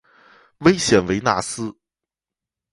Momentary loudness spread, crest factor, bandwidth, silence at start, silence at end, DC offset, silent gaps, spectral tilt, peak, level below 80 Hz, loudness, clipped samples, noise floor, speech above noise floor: 13 LU; 22 dB; 11.5 kHz; 0.6 s; 1 s; under 0.1%; none; -4.5 dB/octave; 0 dBFS; -48 dBFS; -19 LUFS; under 0.1%; -88 dBFS; 70 dB